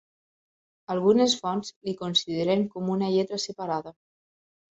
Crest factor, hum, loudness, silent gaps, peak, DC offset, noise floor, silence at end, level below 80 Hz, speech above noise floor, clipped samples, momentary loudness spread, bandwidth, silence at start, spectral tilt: 18 dB; none; -26 LUFS; 1.76-1.81 s; -8 dBFS; under 0.1%; under -90 dBFS; 0.8 s; -68 dBFS; over 64 dB; under 0.1%; 11 LU; 8.2 kHz; 0.9 s; -5 dB/octave